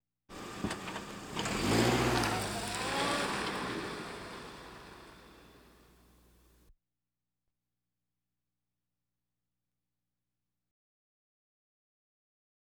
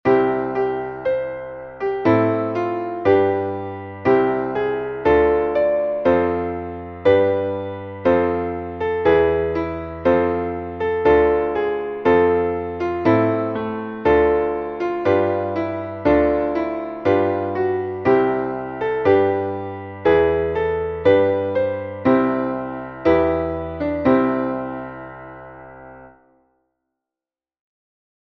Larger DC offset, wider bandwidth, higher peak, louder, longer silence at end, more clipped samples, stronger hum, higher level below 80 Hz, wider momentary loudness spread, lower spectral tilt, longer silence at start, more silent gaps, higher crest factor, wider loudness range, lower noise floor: neither; first, over 20 kHz vs 6.2 kHz; second, -14 dBFS vs -2 dBFS; second, -34 LUFS vs -20 LUFS; first, 7.05 s vs 2.3 s; neither; first, 60 Hz at -65 dBFS vs none; second, -56 dBFS vs -44 dBFS; first, 22 LU vs 11 LU; second, -4 dB/octave vs -9 dB/octave; first, 0.3 s vs 0.05 s; neither; first, 24 dB vs 16 dB; first, 18 LU vs 2 LU; about the same, under -90 dBFS vs under -90 dBFS